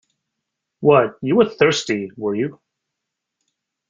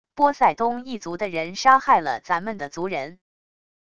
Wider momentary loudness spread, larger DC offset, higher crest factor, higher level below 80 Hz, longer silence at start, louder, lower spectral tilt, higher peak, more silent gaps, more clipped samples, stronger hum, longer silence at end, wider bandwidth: second, 10 LU vs 14 LU; second, under 0.1% vs 0.5%; about the same, 18 dB vs 20 dB; about the same, -60 dBFS vs -60 dBFS; first, 0.8 s vs 0.15 s; first, -18 LUFS vs -22 LUFS; about the same, -5 dB/octave vs -4 dB/octave; about the same, -2 dBFS vs -2 dBFS; neither; neither; neither; first, 1.35 s vs 0.75 s; second, 7.6 kHz vs 9.2 kHz